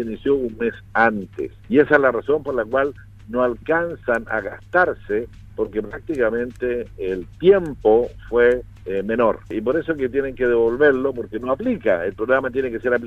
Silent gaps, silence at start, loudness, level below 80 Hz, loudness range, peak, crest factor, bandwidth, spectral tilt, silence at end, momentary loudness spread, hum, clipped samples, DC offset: none; 0 s; -20 LUFS; -44 dBFS; 3 LU; 0 dBFS; 20 dB; 7.8 kHz; -7.5 dB/octave; 0 s; 10 LU; none; under 0.1%; under 0.1%